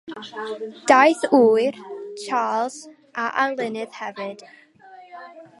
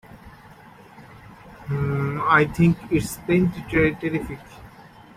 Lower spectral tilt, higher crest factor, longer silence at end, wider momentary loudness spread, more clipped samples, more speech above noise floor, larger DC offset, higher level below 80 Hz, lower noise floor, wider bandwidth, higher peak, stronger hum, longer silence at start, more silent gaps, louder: second, -3.5 dB/octave vs -7 dB/octave; about the same, 22 dB vs 22 dB; second, 0.2 s vs 0.35 s; first, 22 LU vs 12 LU; neither; about the same, 26 dB vs 26 dB; neither; second, -76 dBFS vs -44 dBFS; about the same, -47 dBFS vs -47 dBFS; second, 11.5 kHz vs 16 kHz; about the same, 0 dBFS vs -2 dBFS; neither; about the same, 0.05 s vs 0.15 s; neither; about the same, -20 LUFS vs -22 LUFS